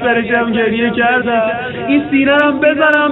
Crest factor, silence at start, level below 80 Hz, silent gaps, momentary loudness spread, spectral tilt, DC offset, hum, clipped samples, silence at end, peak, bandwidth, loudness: 12 dB; 0 s; -48 dBFS; none; 5 LU; -7.5 dB/octave; under 0.1%; none; under 0.1%; 0 s; 0 dBFS; 4.1 kHz; -13 LUFS